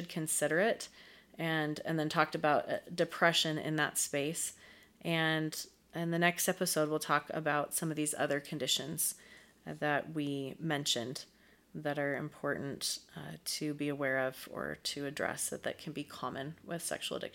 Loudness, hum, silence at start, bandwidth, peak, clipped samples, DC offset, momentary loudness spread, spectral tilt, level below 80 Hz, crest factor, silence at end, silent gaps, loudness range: -34 LUFS; none; 0 s; 17 kHz; -12 dBFS; under 0.1%; under 0.1%; 12 LU; -3 dB/octave; -74 dBFS; 24 dB; 0.05 s; none; 5 LU